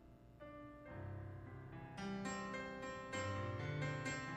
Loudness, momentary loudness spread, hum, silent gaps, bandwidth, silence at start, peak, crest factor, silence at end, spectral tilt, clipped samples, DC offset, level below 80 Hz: -47 LUFS; 13 LU; none; none; 12 kHz; 0 s; -32 dBFS; 14 dB; 0 s; -5.5 dB/octave; under 0.1%; under 0.1%; -66 dBFS